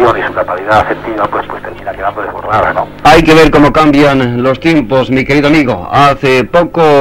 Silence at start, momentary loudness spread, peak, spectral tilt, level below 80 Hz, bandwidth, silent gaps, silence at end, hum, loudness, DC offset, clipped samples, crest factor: 0 s; 12 LU; 0 dBFS; -6 dB/octave; -28 dBFS; 16.5 kHz; none; 0 s; none; -9 LUFS; under 0.1%; 2%; 8 dB